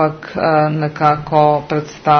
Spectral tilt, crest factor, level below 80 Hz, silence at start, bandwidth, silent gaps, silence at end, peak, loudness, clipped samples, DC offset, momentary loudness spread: -7.5 dB/octave; 14 dB; -48 dBFS; 0 s; 6.6 kHz; none; 0 s; 0 dBFS; -15 LUFS; under 0.1%; under 0.1%; 6 LU